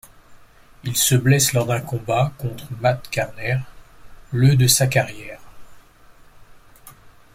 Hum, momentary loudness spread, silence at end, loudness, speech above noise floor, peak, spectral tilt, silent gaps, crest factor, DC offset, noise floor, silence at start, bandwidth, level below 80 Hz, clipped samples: none; 15 LU; 0.25 s; -19 LUFS; 29 dB; -2 dBFS; -4 dB/octave; none; 20 dB; under 0.1%; -48 dBFS; 0.3 s; 16.5 kHz; -48 dBFS; under 0.1%